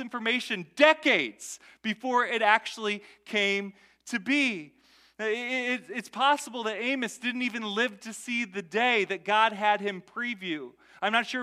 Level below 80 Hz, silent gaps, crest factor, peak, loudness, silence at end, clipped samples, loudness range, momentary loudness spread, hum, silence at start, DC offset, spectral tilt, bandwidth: -80 dBFS; none; 24 dB; -6 dBFS; -27 LUFS; 0 s; under 0.1%; 4 LU; 12 LU; none; 0 s; under 0.1%; -3 dB/octave; 15 kHz